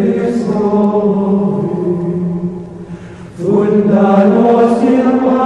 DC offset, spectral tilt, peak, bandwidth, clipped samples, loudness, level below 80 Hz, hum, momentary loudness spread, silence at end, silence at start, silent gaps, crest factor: under 0.1%; -9 dB/octave; -2 dBFS; 9.6 kHz; under 0.1%; -12 LUFS; -48 dBFS; none; 18 LU; 0 s; 0 s; none; 10 dB